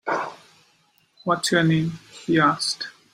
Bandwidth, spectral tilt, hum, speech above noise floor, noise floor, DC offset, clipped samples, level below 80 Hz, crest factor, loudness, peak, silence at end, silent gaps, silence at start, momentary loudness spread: 15 kHz; -4.5 dB/octave; none; 41 dB; -62 dBFS; under 0.1%; under 0.1%; -62 dBFS; 18 dB; -22 LUFS; -6 dBFS; 0.25 s; none; 0.05 s; 13 LU